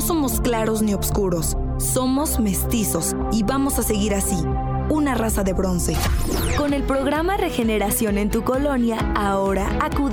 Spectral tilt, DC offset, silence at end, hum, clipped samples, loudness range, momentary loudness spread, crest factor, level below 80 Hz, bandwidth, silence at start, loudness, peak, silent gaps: -5 dB/octave; under 0.1%; 0 s; none; under 0.1%; 1 LU; 2 LU; 14 dB; -28 dBFS; 19.5 kHz; 0 s; -21 LUFS; -6 dBFS; none